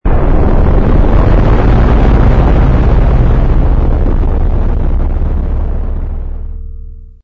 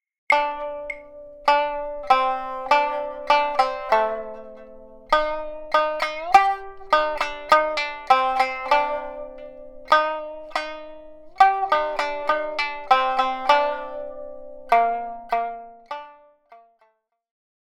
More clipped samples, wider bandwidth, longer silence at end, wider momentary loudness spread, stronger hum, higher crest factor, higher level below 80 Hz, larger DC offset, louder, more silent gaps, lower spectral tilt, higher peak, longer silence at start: neither; second, 4.5 kHz vs 16 kHz; second, 0.2 s vs 1.1 s; second, 13 LU vs 18 LU; neither; second, 8 dB vs 20 dB; first, -10 dBFS vs -50 dBFS; neither; first, -12 LUFS vs -22 LUFS; neither; first, -10 dB/octave vs -2 dB/octave; first, 0 dBFS vs -4 dBFS; second, 0.05 s vs 0.3 s